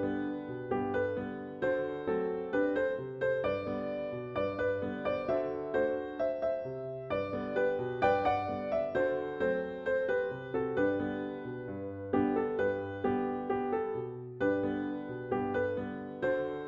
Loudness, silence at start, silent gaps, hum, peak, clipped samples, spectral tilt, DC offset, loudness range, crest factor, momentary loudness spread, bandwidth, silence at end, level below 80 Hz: -34 LUFS; 0 s; none; none; -16 dBFS; under 0.1%; -8.5 dB/octave; under 0.1%; 2 LU; 18 dB; 7 LU; 7 kHz; 0 s; -62 dBFS